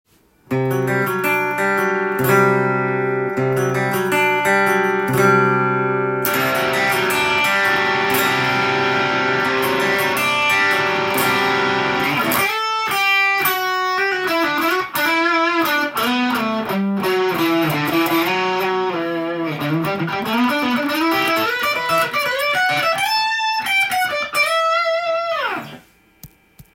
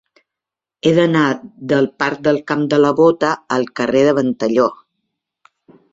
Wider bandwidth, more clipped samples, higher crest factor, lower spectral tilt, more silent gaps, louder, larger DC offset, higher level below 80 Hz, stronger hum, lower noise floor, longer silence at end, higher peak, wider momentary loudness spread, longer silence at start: first, 17 kHz vs 7.8 kHz; neither; about the same, 16 dB vs 16 dB; second, -4 dB/octave vs -6.5 dB/octave; neither; about the same, -17 LUFS vs -16 LUFS; neither; about the same, -58 dBFS vs -58 dBFS; neither; second, -45 dBFS vs -86 dBFS; second, 0.1 s vs 1.2 s; about the same, -2 dBFS vs -2 dBFS; about the same, 5 LU vs 6 LU; second, 0.5 s vs 0.85 s